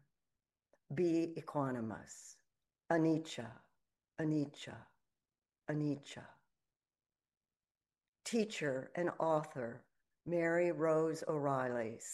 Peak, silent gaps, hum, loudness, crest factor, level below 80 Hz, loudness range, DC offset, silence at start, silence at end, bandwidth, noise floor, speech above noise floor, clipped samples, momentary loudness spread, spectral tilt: -20 dBFS; 7.37-7.41 s, 8.08-8.13 s; none; -38 LUFS; 20 dB; -82 dBFS; 9 LU; under 0.1%; 0.9 s; 0 s; 12 kHz; under -90 dBFS; over 53 dB; under 0.1%; 18 LU; -6 dB/octave